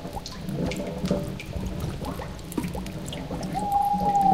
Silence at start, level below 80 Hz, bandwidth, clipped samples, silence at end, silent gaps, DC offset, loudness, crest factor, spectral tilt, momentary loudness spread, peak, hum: 0 s; -40 dBFS; 16 kHz; under 0.1%; 0 s; none; 0.3%; -29 LUFS; 18 dB; -6 dB/octave; 11 LU; -10 dBFS; none